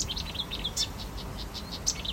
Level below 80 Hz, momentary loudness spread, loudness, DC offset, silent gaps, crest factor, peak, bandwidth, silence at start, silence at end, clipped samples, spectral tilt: -42 dBFS; 8 LU; -33 LUFS; under 0.1%; none; 22 dB; -14 dBFS; 16 kHz; 0 s; 0 s; under 0.1%; -2 dB/octave